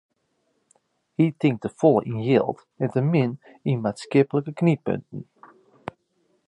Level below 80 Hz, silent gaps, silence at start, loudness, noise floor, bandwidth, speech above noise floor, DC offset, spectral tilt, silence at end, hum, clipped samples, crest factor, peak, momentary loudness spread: -64 dBFS; none; 1.2 s; -23 LUFS; -71 dBFS; 10.5 kHz; 49 dB; under 0.1%; -8.5 dB/octave; 1.25 s; none; under 0.1%; 20 dB; -6 dBFS; 19 LU